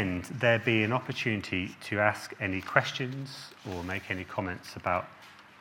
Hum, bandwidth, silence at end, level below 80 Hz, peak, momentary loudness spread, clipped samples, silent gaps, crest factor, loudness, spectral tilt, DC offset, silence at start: none; 17.5 kHz; 0 s; -68 dBFS; -6 dBFS; 13 LU; under 0.1%; none; 26 dB; -30 LUFS; -5.5 dB/octave; under 0.1%; 0 s